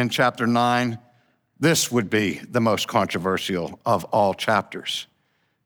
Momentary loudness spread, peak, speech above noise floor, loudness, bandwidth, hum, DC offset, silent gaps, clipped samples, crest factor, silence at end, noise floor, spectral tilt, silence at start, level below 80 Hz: 8 LU; -6 dBFS; 47 dB; -22 LUFS; over 20 kHz; none; under 0.1%; none; under 0.1%; 16 dB; 0.6 s; -69 dBFS; -4 dB/octave; 0 s; -64 dBFS